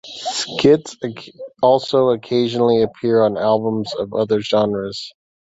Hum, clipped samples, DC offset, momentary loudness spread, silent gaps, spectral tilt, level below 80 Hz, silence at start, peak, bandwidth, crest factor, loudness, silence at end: none; under 0.1%; under 0.1%; 14 LU; none; -5.5 dB/octave; -56 dBFS; 0.05 s; -2 dBFS; 8 kHz; 16 dB; -18 LUFS; 0.3 s